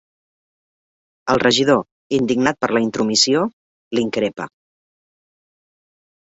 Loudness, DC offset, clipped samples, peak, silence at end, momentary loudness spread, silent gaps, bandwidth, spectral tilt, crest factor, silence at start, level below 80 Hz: -18 LUFS; under 0.1%; under 0.1%; -2 dBFS; 1.85 s; 11 LU; 1.91-2.10 s, 3.53-3.91 s; 8 kHz; -3.5 dB/octave; 20 dB; 1.25 s; -56 dBFS